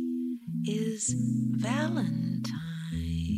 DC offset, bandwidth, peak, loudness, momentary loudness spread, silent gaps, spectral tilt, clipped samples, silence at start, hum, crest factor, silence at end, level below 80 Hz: under 0.1%; 14.5 kHz; -18 dBFS; -31 LUFS; 6 LU; none; -5.5 dB/octave; under 0.1%; 0 s; none; 12 dB; 0 s; -48 dBFS